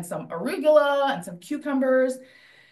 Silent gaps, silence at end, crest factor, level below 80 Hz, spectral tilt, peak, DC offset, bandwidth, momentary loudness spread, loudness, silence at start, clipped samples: none; 0.45 s; 18 dB; -78 dBFS; -5 dB/octave; -6 dBFS; under 0.1%; 12.5 kHz; 14 LU; -23 LUFS; 0 s; under 0.1%